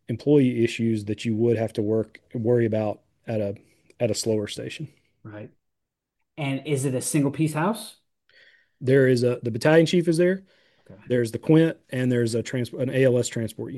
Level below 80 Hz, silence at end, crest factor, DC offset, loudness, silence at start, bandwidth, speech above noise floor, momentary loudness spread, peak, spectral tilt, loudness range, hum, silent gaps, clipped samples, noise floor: -66 dBFS; 0 s; 18 dB; under 0.1%; -24 LUFS; 0.1 s; 12.5 kHz; 59 dB; 14 LU; -6 dBFS; -6 dB/octave; 7 LU; none; none; under 0.1%; -82 dBFS